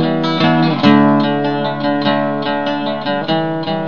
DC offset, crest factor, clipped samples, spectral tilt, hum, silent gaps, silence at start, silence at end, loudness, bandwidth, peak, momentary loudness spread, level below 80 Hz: 2%; 14 dB; under 0.1%; -4.5 dB/octave; none; none; 0 s; 0 s; -15 LUFS; 6.8 kHz; 0 dBFS; 8 LU; -60 dBFS